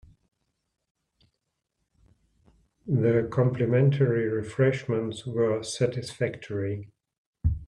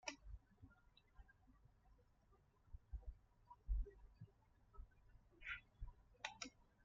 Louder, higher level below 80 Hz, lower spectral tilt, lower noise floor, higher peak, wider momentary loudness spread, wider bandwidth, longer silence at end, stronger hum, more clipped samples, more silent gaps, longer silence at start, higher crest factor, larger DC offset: first, -26 LUFS vs -55 LUFS; first, -46 dBFS vs -56 dBFS; first, -7 dB/octave vs -3 dB/octave; first, -81 dBFS vs -75 dBFS; first, -10 dBFS vs -30 dBFS; second, 9 LU vs 17 LU; first, 11 kHz vs 7 kHz; second, 0 s vs 0.2 s; neither; neither; first, 7.18-7.33 s vs none; first, 2.85 s vs 0.05 s; second, 18 dB vs 26 dB; neither